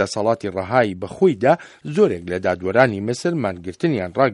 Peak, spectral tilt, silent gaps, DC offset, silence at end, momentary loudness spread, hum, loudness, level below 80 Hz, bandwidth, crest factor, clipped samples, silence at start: 0 dBFS; -6.5 dB/octave; none; under 0.1%; 0 s; 7 LU; none; -20 LUFS; -56 dBFS; 11.5 kHz; 20 dB; under 0.1%; 0 s